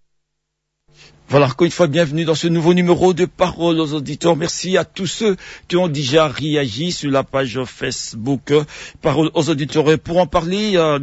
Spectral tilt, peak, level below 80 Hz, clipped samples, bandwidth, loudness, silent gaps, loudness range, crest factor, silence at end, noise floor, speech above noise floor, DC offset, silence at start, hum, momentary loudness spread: -5.5 dB/octave; -2 dBFS; -46 dBFS; under 0.1%; 8 kHz; -17 LUFS; none; 3 LU; 16 dB; 0 s; -75 dBFS; 58 dB; under 0.1%; 1.3 s; none; 8 LU